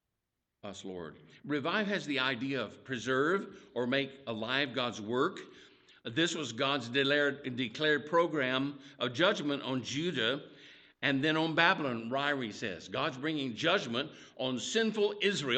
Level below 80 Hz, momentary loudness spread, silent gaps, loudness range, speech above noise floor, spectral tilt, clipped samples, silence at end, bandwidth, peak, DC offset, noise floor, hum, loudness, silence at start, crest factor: -76 dBFS; 11 LU; none; 3 LU; 53 dB; -4 dB/octave; under 0.1%; 0 s; 8.8 kHz; -10 dBFS; under 0.1%; -86 dBFS; none; -32 LUFS; 0.65 s; 24 dB